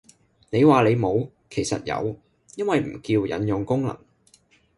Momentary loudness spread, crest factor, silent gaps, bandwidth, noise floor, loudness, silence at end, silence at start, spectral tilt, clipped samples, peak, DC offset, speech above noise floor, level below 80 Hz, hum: 14 LU; 18 dB; none; 11.5 kHz; -59 dBFS; -23 LUFS; 0.8 s; 0.5 s; -6.5 dB/octave; under 0.1%; -4 dBFS; under 0.1%; 37 dB; -54 dBFS; none